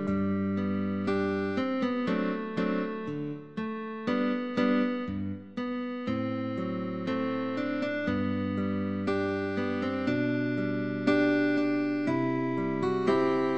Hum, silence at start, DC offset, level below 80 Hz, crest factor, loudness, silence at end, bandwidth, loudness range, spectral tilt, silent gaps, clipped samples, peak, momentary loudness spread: none; 0 s; 0.2%; -62 dBFS; 16 dB; -30 LUFS; 0 s; 8.4 kHz; 3 LU; -8 dB/octave; none; under 0.1%; -12 dBFS; 8 LU